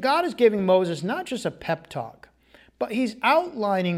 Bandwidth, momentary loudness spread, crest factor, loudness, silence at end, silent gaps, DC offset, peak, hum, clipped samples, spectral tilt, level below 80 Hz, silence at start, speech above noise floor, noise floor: 16 kHz; 12 LU; 18 dB; -24 LUFS; 0 s; none; under 0.1%; -6 dBFS; none; under 0.1%; -6 dB/octave; -62 dBFS; 0 s; 33 dB; -56 dBFS